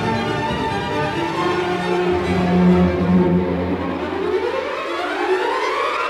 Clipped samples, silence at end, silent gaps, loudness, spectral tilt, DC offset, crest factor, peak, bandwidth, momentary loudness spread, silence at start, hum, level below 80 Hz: under 0.1%; 0 s; none; -19 LUFS; -7 dB/octave; under 0.1%; 14 dB; -4 dBFS; 11 kHz; 7 LU; 0 s; none; -42 dBFS